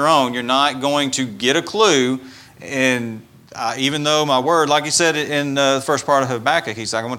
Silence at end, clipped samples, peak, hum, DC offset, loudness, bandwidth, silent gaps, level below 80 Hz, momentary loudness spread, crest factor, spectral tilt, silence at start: 0 s; under 0.1%; 0 dBFS; none; under 0.1%; -17 LUFS; 17 kHz; none; -62 dBFS; 10 LU; 18 dB; -3 dB/octave; 0 s